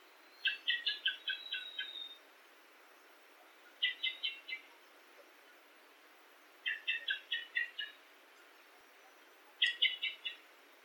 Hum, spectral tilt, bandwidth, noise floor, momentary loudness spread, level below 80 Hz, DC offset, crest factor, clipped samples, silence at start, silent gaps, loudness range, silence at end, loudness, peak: none; 3.5 dB/octave; 18 kHz; -62 dBFS; 26 LU; under -90 dBFS; under 0.1%; 26 dB; under 0.1%; 0 s; none; 4 LU; 0.05 s; -37 LUFS; -16 dBFS